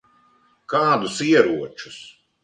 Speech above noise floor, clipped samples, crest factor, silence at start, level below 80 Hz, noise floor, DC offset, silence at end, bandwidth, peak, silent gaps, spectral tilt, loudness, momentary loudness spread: 39 dB; under 0.1%; 20 dB; 0.7 s; -66 dBFS; -59 dBFS; under 0.1%; 0.35 s; 9.8 kHz; -2 dBFS; none; -4.5 dB/octave; -19 LUFS; 20 LU